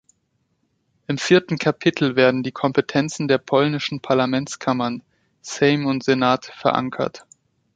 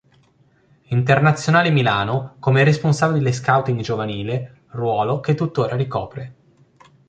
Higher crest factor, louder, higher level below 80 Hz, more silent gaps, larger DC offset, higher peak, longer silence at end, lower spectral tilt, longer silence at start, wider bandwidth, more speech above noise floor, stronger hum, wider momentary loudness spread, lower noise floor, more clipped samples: about the same, 20 dB vs 18 dB; about the same, -20 LUFS vs -19 LUFS; second, -60 dBFS vs -52 dBFS; neither; neither; about the same, -2 dBFS vs -2 dBFS; second, 0.55 s vs 0.8 s; about the same, -5.5 dB/octave vs -6.5 dB/octave; first, 1.1 s vs 0.9 s; about the same, 9.2 kHz vs 9 kHz; first, 50 dB vs 39 dB; neither; about the same, 10 LU vs 11 LU; first, -69 dBFS vs -57 dBFS; neither